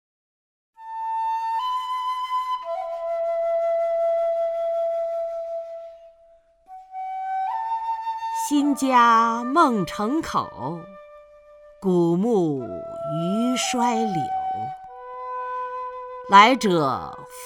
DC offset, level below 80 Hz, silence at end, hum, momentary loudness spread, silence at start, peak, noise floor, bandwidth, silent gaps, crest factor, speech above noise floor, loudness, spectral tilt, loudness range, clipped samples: under 0.1%; -62 dBFS; 0 s; none; 16 LU; 0.8 s; 0 dBFS; -55 dBFS; 18 kHz; none; 24 dB; 35 dB; -23 LUFS; -5 dB/octave; 7 LU; under 0.1%